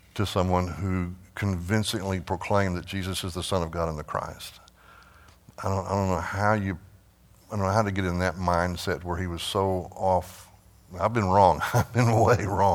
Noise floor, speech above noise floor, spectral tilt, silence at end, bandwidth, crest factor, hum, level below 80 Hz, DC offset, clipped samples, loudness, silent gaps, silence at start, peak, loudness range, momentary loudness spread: -57 dBFS; 31 dB; -6 dB/octave; 0 s; 17 kHz; 22 dB; none; -48 dBFS; under 0.1%; under 0.1%; -26 LUFS; none; 0.15 s; -6 dBFS; 6 LU; 11 LU